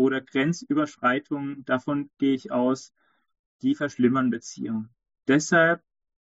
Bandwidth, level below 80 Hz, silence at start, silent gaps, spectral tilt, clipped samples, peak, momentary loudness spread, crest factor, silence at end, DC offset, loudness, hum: 8 kHz; -70 dBFS; 0 s; 3.39-3.59 s; -5 dB/octave; under 0.1%; -8 dBFS; 11 LU; 18 dB; 0.55 s; under 0.1%; -25 LUFS; none